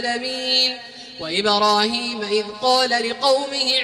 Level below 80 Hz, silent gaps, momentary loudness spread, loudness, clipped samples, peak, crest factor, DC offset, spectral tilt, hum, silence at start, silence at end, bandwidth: -62 dBFS; none; 7 LU; -19 LUFS; under 0.1%; -4 dBFS; 16 dB; under 0.1%; -2 dB/octave; none; 0 s; 0 s; 15.5 kHz